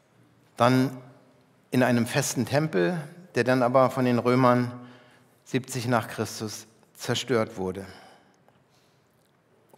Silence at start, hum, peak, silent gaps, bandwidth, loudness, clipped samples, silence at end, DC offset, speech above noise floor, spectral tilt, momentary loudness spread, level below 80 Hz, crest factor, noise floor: 0.6 s; none; -6 dBFS; none; 16 kHz; -25 LUFS; under 0.1%; 1.8 s; under 0.1%; 40 dB; -5.5 dB/octave; 14 LU; -74 dBFS; 22 dB; -64 dBFS